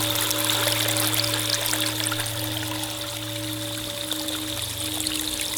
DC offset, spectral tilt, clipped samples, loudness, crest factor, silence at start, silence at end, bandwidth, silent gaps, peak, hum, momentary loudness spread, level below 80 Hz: under 0.1%; -2 dB/octave; under 0.1%; -24 LUFS; 26 dB; 0 s; 0 s; over 20 kHz; none; 0 dBFS; none; 8 LU; -52 dBFS